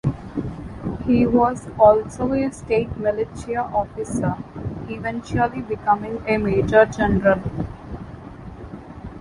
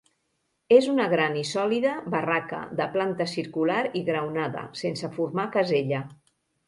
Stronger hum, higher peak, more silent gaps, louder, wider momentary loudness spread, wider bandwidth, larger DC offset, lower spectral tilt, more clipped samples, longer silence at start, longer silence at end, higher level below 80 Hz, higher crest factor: neither; first, -2 dBFS vs -6 dBFS; neither; first, -21 LUFS vs -26 LUFS; first, 20 LU vs 11 LU; about the same, 11.5 kHz vs 11.5 kHz; neither; first, -7.5 dB/octave vs -5.5 dB/octave; neither; second, 0.05 s vs 0.7 s; second, 0 s vs 0.55 s; first, -40 dBFS vs -70 dBFS; about the same, 20 dB vs 20 dB